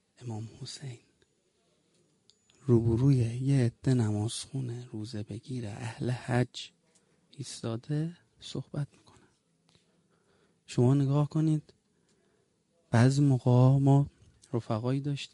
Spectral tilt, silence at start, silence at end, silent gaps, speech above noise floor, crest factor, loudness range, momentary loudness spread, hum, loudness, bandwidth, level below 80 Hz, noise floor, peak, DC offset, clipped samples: -7.5 dB/octave; 0.2 s; 0.05 s; none; 44 dB; 20 dB; 12 LU; 17 LU; none; -29 LUFS; 11.5 kHz; -60 dBFS; -72 dBFS; -10 dBFS; under 0.1%; under 0.1%